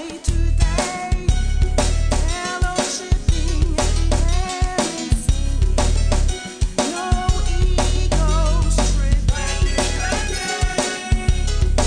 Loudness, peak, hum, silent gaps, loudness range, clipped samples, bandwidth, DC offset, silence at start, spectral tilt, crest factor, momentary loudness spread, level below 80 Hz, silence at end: -21 LUFS; -4 dBFS; none; none; 1 LU; under 0.1%; 10 kHz; under 0.1%; 0 s; -4.5 dB/octave; 14 dB; 3 LU; -18 dBFS; 0 s